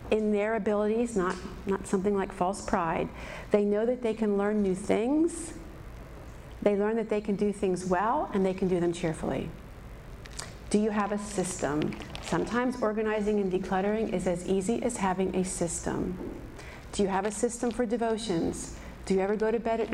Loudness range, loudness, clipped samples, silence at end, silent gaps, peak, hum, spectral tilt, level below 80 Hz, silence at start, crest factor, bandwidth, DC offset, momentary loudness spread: 3 LU; -29 LUFS; under 0.1%; 0 s; none; -12 dBFS; none; -5.5 dB/octave; -48 dBFS; 0 s; 18 dB; 13.5 kHz; under 0.1%; 14 LU